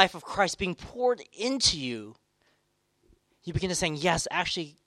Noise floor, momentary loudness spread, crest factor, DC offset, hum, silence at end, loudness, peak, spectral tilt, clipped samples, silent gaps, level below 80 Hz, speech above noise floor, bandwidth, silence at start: -73 dBFS; 11 LU; 26 dB; under 0.1%; none; 0.15 s; -28 LUFS; -2 dBFS; -3 dB/octave; under 0.1%; none; -52 dBFS; 45 dB; 13.5 kHz; 0 s